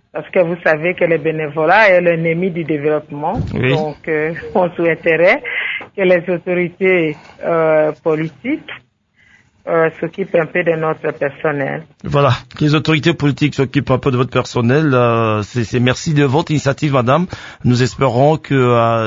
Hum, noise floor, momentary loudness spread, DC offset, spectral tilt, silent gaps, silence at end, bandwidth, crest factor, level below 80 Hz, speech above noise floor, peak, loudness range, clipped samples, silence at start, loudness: none; -53 dBFS; 8 LU; under 0.1%; -6.5 dB/octave; none; 0 s; 7.8 kHz; 14 dB; -44 dBFS; 39 dB; 0 dBFS; 4 LU; under 0.1%; 0.15 s; -15 LUFS